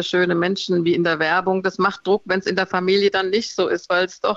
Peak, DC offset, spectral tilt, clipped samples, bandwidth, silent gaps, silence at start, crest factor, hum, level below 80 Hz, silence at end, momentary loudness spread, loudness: -6 dBFS; under 0.1%; -5 dB/octave; under 0.1%; 7.8 kHz; none; 0 s; 14 dB; none; -62 dBFS; 0 s; 4 LU; -20 LUFS